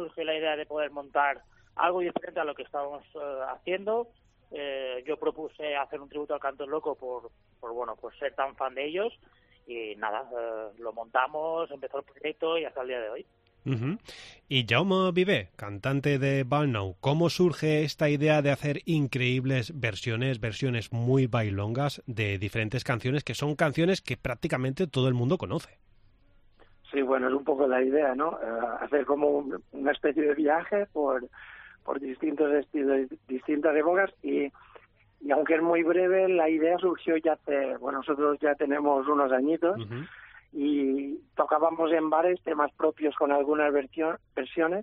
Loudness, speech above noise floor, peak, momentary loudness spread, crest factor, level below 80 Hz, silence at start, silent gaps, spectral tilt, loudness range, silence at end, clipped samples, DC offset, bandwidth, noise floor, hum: -28 LUFS; 32 dB; -8 dBFS; 12 LU; 20 dB; -62 dBFS; 0 s; none; -7 dB/octave; 8 LU; 0 s; under 0.1%; under 0.1%; 13 kHz; -60 dBFS; none